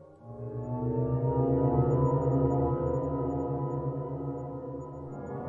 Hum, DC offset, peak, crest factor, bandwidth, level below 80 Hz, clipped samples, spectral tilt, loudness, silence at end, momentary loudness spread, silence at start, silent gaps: none; under 0.1%; -12 dBFS; 18 dB; 7.2 kHz; -48 dBFS; under 0.1%; -12 dB/octave; -30 LUFS; 0 s; 14 LU; 0 s; none